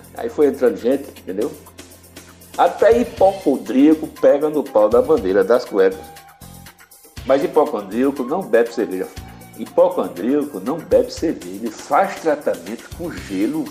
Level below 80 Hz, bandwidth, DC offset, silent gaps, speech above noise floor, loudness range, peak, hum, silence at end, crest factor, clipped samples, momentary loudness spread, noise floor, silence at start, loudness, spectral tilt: -48 dBFS; 16 kHz; under 0.1%; none; 28 dB; 5 LU; -4 dBFS; none; 0 s; 16 dB; under 0.1%; 14 LU; -45 dBFS; 0.15 s; -18 LUFS; -6 dB/octave